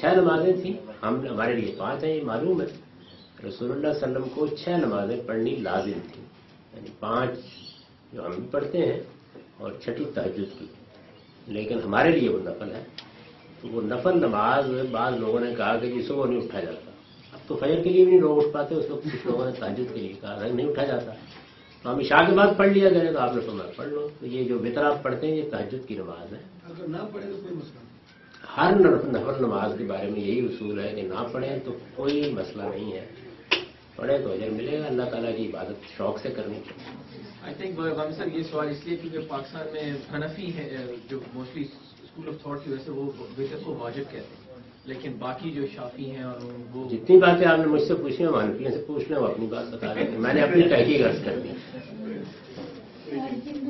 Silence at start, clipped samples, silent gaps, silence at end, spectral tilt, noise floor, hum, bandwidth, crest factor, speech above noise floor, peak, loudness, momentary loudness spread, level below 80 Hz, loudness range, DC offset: 0 s; under 0.1%; none; 0 s; -8 dB/octave; -51 dBFS; none; 6 kHz; 24 dB; 25 dB; -2 dBFS; -26 LUFS; 20 LU; -60 dBFS; 13 LU; under 0.1%